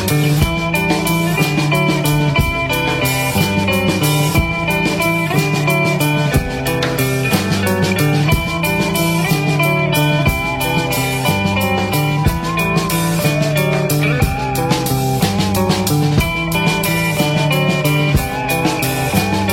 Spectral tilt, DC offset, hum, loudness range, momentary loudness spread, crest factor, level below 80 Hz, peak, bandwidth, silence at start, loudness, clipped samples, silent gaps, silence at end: -5 dB/octave; under 0.1%; none; 1 LU; 2 LU; 12 dB; -30 dBFS; -2 dBFS; 16.5 kHz; 0 s; -15 LUFS; under 0.1%; none; 0 s